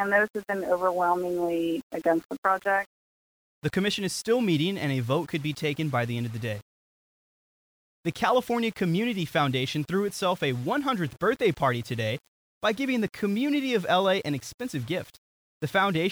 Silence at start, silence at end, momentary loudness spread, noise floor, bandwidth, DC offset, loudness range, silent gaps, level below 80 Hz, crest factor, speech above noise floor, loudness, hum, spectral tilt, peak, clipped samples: 0 s; 0 s; 9 LU; under -90 dBFS; over 20 kHz; under 0.1%; 3 LU; 1.83-1.90 s, 2.25-2.29 s, 2.38-2.43 s, 2.86-3.62 s, 6.62-8.03 s, 12.28-12.61 s, 14.54-14.58 s, 15.18-15.61 s; -62 dBFS; 18 dB; over 63 dB; -27 LUFS; none; -5.5 dB/octave; -10 dBFS; under 0.1%